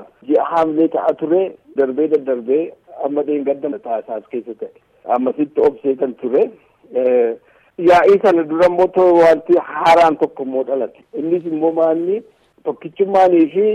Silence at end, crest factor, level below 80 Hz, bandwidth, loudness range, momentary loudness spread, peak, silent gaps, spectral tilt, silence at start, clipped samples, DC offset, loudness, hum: 0 s; 12 dB; -58 dBFS; 10 kHz; 7 LU; 14 LU; -2 dBFS; none; -6.5 dB/octave; 0 s; under 0.1%; under 0.1%; -16 LUFS; none